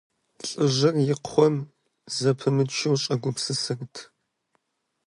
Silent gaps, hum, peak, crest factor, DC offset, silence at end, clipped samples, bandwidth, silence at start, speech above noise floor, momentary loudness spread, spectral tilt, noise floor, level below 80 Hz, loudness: none; none; -6 dBFS; 20 dB; under 0.1%; 1.05 s; under 0.1%; 11.5 kHz; 0.45 s; 54 dB; 13 LU; -5 dB/octave; -78 dBFS; -70 dBFS; -24 LUFS